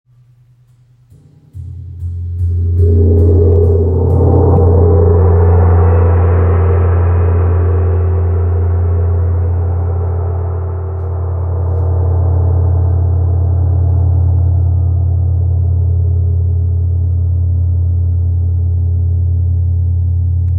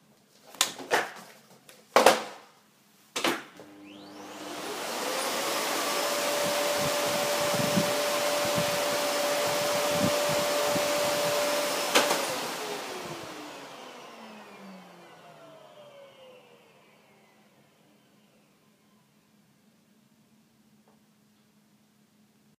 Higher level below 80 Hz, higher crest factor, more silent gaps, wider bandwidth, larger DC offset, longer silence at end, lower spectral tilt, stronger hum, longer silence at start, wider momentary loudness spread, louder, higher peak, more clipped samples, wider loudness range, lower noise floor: first, -26 dBFS vs -70 dBFS; second, 10 dB vs 30 dB; neither; second, 2.5 kHz vs 15.5 kHz; neither; second, 0 s vs 6.2 s; first, -13 dB/octave vs -2 dB/octave; neither; first, 1.55 s vs 0.45 s; second, 8 LU vs 21 LU; first, -13 LUFS vs -27 LUFS; about the same, 0 dBFS vs 0 dBFS; neither; second, 6 LU vs 15 LU; second, -47 dBFS vs -64 dBFS